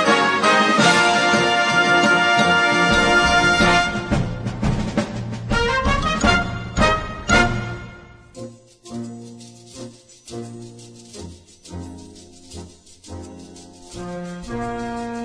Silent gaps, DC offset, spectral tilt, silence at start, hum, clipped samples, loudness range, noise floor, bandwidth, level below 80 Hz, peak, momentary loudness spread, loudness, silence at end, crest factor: none; under 0.1%; -4 dB/octave; 0 s; none; under 0.1%; 22 LU; -42 dBFS; 11 kHz; -34 dBFS; -2 dBFS; 24 LU; -17 LUFS; 0 s; 18 dB